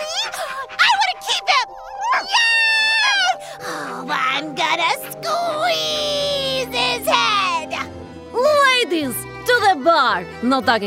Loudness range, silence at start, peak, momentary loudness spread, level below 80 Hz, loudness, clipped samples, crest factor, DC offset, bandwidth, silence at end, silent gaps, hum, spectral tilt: 3 LU; 0 s; -2 dBFS; 13 LU; -56 dBFS; -18 LUFS; under 0.1%; 18 dB; under 0.1%; 16 kHz; 0 s; none; none; -2 dB/octave